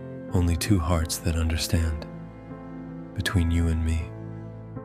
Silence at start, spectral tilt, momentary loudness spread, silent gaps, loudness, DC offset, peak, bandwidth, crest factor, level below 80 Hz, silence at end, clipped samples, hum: 0 s; -5.5 dB/octave; 16 LU; none; -26 LUFS; under 0.1%; -8 dBFS; 15.5 kHz; 18 dB; -34 dBFS; 0 s; under 0.1%; none